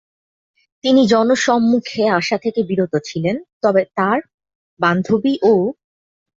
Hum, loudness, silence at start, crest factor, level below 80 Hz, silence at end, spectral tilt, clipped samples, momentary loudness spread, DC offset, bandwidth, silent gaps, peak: none; -17 LUFS; 0.85 s; 14 dB; -60 dBFS; 0.65 s; -5.5 dB/octave; under 0.1%; 8 LU; under 0.1%; 7.8 kHz; 3.53-3.61 s, 4.34-4.38 s, 4.55-4.77 s; -2 dBFS